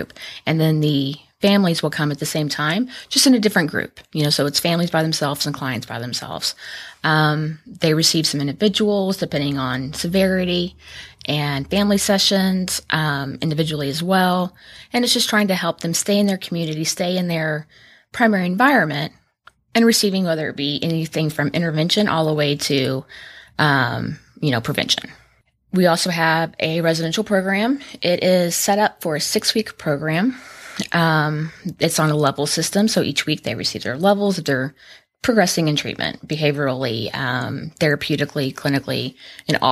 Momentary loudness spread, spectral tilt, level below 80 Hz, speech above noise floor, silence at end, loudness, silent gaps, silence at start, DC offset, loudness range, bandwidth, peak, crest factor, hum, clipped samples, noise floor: 9 LU; -4.5 dB/octave; -54 dBFS; 39 dB; 0 s; -19 LUFS; none; 0 s; under 0.1%; 2 LU; 15.5 kHz; -2 dBFS; 18 dB; none; under 0.1%; -58 dBFS